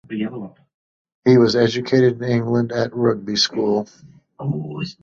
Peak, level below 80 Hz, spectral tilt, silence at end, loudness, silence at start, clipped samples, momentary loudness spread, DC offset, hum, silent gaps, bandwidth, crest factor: -2 dBFS; -58 dBFS; -6 dB/octave; 0.1 s; -19 LUFS; 0.1 s; under 0.1%; 14 LU; under 0.1%; none; 0.74-1.05 s, 1.14-1.22 s; 7.6 kHz; 18 dB